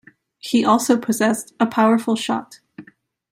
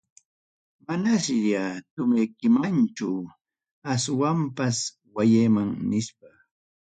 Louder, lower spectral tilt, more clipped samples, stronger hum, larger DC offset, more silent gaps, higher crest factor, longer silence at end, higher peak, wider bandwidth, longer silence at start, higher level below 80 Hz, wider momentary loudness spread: first, -19 LUFS vs -24 LUFS; second, -4 dB/octave vs -5.5 dB/octave; neither; neither; neither; second, none vs 1.91-1.97 s, 3.71-3.82 s; about the same, 18 dB vs 16 dB; about the same, 0.5 s vs 0.6 s; first, -2 dBFS vs -10 dBFS; first, 16 kHz vs 9.4 kHz; second, 0.45 s vs 0.9 s; about the same, -64 dBFS vs -64 dBFS; second, 8 LU vs 11 LU